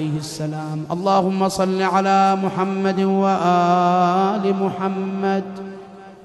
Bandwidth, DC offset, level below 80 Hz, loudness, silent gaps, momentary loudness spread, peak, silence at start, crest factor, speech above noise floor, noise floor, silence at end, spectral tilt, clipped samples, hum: 12.5 kHz; under 0.1%; -60 dBFS; -19 LUFS; none; 10 LU; -4 dBFS; 0 s; 14 dB; 20 dB; -39 dBFS; 0 s; -6.5 dB/octave; under 0.1%; none